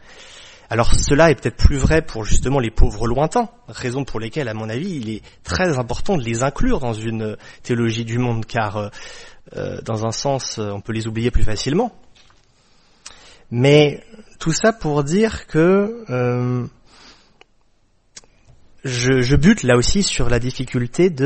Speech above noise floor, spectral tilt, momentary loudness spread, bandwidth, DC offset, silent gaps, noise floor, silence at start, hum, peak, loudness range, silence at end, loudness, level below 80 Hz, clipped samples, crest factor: 40 dB; -5.5 dB/octave; 15 LU; 8.8 kHz; under 0.1%; none; -58 dBFS; 0.1 s; none; 0 dBFS; 6 LU; 0 s; -19 LUFS; -26 dBFS; under 0.1%; 18 dB